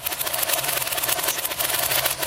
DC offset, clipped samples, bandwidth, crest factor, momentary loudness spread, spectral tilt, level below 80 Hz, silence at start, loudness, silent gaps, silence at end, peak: under 0.1%; under 0.1%; 17.5 kHz; 22 dB; 3 LU; 0 dB/octave; -52 dBFS; 0 s; -21 LUFS; none; 0 s; -2 dBFS